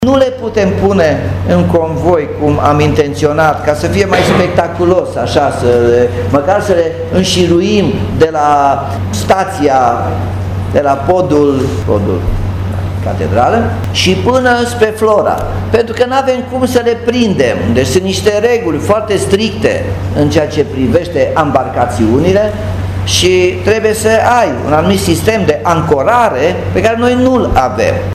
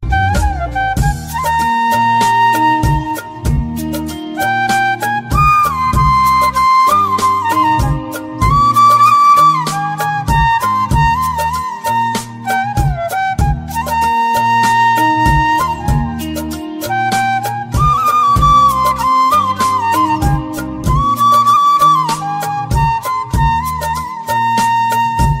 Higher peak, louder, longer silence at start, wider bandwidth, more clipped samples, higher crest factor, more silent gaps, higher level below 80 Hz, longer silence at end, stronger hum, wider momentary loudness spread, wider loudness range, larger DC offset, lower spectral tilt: about the same, 0 dBFS vs 0 dBFS; about the same, -11 LUFS vs -13 LUFS; about the same, 0 s vs 0 s; about the same, 15 kHz vs 16.5 kHz; first, 0.3% vs under 0.1%; about the same, 10 dB vs 12 dB; neither; second, -30 dBFS vs -24 dBFS; about the same, 0 s vs 0 s; neither; second, 5 LU vs 10 LU; about the same, 2 LU vs 4 LU; neither; about the same, -5.5 dB/octave vs -5 dB/octave